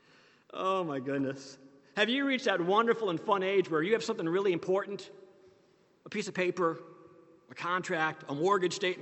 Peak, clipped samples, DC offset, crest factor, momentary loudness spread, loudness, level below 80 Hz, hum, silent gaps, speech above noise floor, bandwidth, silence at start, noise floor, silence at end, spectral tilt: -12 dBFS; under 0.1%; under 0.1%; 20 dB; 13 LU; -31 LUFS; -82 dBFS; none; none; 35 dB; 8.4 kHz; 0.55 s; -66 dBFS; 0 s; -4.5 dB/octave